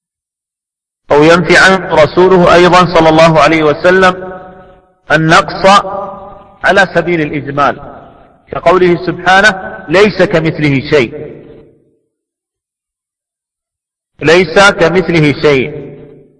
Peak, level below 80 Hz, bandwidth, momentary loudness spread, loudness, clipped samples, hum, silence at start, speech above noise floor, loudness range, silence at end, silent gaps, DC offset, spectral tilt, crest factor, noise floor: 0 dBFS; -36 dBFS; 11 kHz; 14 LU; -8 LUFS; 1%; none; 1.1 s; 76 dB; 9 LU; 0.45 s; none; under 0.1%; -5.5 dB/octave; 10 dB; -83 dBFS